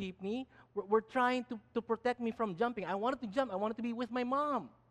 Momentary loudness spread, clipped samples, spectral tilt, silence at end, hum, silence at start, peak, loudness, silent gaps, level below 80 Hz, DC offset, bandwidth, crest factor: 8 LU; under 0.1%; -6 dB/octave; 0.2 s; none; 0 s; -18 dBFS; -36 LUFS; none; -72 dBFS; under 0.1%; 10.5 kHz; 18 dB